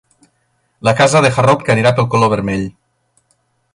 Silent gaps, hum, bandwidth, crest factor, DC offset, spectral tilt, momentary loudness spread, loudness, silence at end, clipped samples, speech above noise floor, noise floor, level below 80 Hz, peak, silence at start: none; none; 11.5 kHz; 14 dB; under 0.1%; -5.5 dB/octave; 9 LU; -13 LUFS; 1.05 s; under 0.1%; 51 dB; -63 dBFS; -46 dBFS; 0 dBFS; 0.85 s